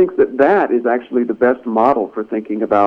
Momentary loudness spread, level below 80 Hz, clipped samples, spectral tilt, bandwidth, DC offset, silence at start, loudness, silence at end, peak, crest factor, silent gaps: 8 LU; -58 dBFS; under 0.1%; -8.5 dB/octave; 5.6 kHz; under 0.1%; 0 s; -16 LUFS; 0 s; 0 dBFS; 14 dB; none